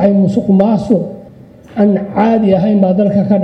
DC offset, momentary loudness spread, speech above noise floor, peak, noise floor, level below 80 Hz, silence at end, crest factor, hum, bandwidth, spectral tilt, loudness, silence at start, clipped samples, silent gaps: under 0.1%; 4 LU; 26 dB; 0 dBFS; -37 dBFS; -46 dBFS; 0 s; 12 dB; none; 6 kHz; -10 dB/octave; -12 LUFS; 0 s; under 0.1%; none